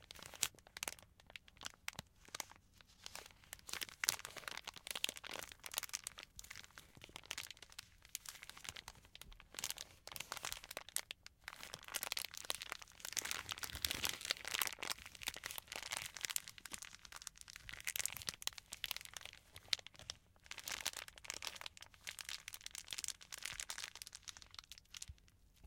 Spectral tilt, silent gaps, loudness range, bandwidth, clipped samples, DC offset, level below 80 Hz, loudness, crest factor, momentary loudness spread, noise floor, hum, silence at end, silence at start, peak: 0.5 dB/octave; none; 7 LU; 17 kHz; under 0.1%; under 0.1%; -70 dBFS; -46 LUFS; 40 dB; 14 LU; -68 dBFS; none; 0 s; 0 s; -8 dBFS